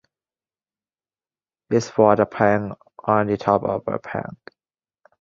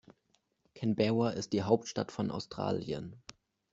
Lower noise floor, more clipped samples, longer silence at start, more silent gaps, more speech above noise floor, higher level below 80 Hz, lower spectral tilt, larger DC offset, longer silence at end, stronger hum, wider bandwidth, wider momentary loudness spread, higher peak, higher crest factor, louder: first, under -90 dBFS vs -76 dBFS; neither; first, 1.7 s vs 0.75 s; neither; first, over 70 dB vs 43 dB; first, -56 dBFS vs -68 dBFS; about the same, -7 dB/octave vs -6 dB/octave; neither; first, 0.9 s vs 0.55 s; neither; about the same, 7.6 kHz vs 8 kHz; about the same, 14 LU vs 13 LU; first, -2 dBFS vs -12 dBFS; about the same, 22 dB vs 24 dB; first, -21 LUFS vs -34 LUFS